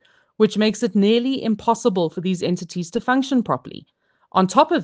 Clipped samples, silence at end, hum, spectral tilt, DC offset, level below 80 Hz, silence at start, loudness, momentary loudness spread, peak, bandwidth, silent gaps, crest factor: under 0.1%; 0 s; none; -5.5 dB/octave; under 0.1%; -64 dBFS; 0.4 s; -20 LUFS; 8 LU; 0 dBFS; 9.6 kHz; none; 20 dB